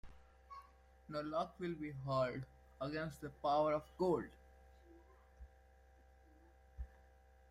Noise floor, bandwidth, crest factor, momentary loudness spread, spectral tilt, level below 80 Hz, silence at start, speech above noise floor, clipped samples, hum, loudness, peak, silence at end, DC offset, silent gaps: -66 dBFS; 14.5 kHz; 20 dB; 22 LU; -7 dB/octave; -62 dBFS; 0.05 s; 26 dB; under 0.1%; none; -41 LUFS; -24 dBFS; 0.55 s; under 0.1%; none